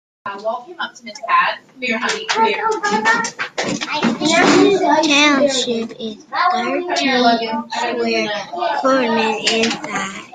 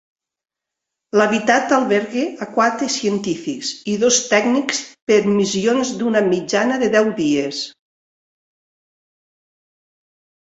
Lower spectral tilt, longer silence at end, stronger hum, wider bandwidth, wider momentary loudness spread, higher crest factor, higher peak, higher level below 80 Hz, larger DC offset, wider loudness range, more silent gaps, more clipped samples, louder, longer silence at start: about the same, -3 dB/octave vs -3.5 dB/octave; second, 0.05 s vs 2.85 s; neither; first, 9.6 kHz vs 8.2 kHz; first, 13 LU vs 8 LU; about the same, 18 dB vs 18 dB; about the same, 0 dBFS vs -2 dBFS; about the same, -60 dBFS vs -62 dBFS; neither; about the same, 4 LU vs 6 LU; second, none vs 5.02-5.07 s; neither; about the same, -16 LUFS vs -18 LUFS; second, 0.25 s vs 1.15 s